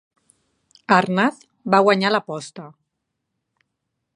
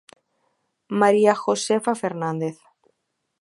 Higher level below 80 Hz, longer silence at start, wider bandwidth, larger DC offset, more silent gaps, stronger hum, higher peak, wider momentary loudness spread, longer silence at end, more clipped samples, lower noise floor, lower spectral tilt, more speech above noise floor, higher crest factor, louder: about the same, -72 dBFS vs -76 dBFS; about the same, 0.9 s vs 0.9 s; about the same, 11 kHz vs 11.5 kHz; neither; neither; neither; about the same, 0 dBFS vs -2 dBFS; first, 21 LU vs 12 LU; first, 1.5 s vs 0.85 s; neither; about the same, -78 dBFS vs -76 dBFS; about the same, -5.5 dB/octave vs -5 dB/octave; about the same, 59 dB vs 56 dB; about the same, 22 dB vs 20 dB; first, -18 LUFS vs -21 LUFS